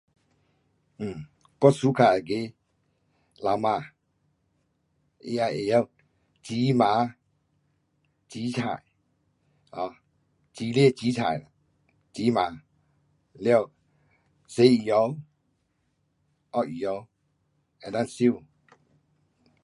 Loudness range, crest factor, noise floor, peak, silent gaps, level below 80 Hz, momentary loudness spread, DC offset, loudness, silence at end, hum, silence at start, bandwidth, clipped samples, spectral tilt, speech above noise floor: 6 LU; 24 dB; -73 dBFS; -4 dBFS; none; -66 dBFS; 17 LU; under 0.1%; -26 LUFS; 1.25 s; none; 1 s; 11.5 kHz; under 0.1%; -6.5 dB/octave; 49 dB